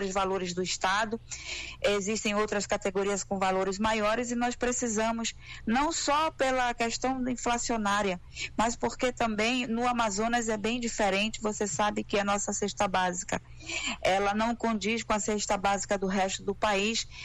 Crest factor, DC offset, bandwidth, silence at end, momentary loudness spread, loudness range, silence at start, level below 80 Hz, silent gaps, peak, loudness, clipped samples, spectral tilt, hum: 12 dB; under 0.1%; 12.5 kHz; 0 s; 5 LU; 1 LU; 0 s; -48 dBFS; none; -18 dBFS; -29 LUFS; under 0.1%; -3 dB/octave; none